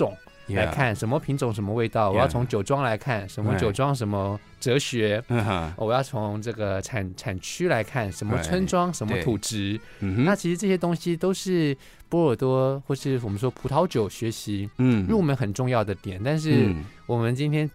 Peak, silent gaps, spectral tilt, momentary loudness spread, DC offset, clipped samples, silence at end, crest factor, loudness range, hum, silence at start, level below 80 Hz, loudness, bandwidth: -8 dBFS; none; -6 dB/octave; 8 LU; under 0.1%; under 0.1%; 0.05 s; 16 dB; 2 LU; none; 0 s; -48 dBFS; -25 LUFS; 16 kHz